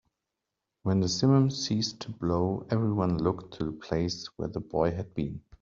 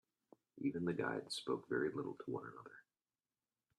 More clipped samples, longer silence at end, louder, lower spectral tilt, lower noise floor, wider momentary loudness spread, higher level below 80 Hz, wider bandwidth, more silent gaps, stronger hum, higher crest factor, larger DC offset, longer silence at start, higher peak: neither; second, 0.2 s vs 1 s; first, -29 LUFS vs -42 LUFS; about the same, -6.5 dB/octave vs -5.5 dB/octave; second, -86 dBFS vs under -90 dBFS; about the same, 12 LU vs 12 LU; first, -54 dBFS vs -82 dBFS; second, 7.6 kHz vs 12.5 kHz; neither; neither; about the same, 18 dB vs 20 dB; neither; first, 0.85 s vs 0.55 s; first, -10 dBFS vs -26 dBFS